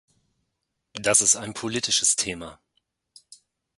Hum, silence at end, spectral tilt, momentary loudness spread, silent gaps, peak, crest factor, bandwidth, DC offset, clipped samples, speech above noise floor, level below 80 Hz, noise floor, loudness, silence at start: none; 1.25 s; -1 dB/octave; 20 LU; none; -4 dBFS; 22 dB; 12 kHz; under 0.1%; under 0.1%; 55 dB; -60 dBFS; -79 dBFS; -21 LUFS; 0.95 s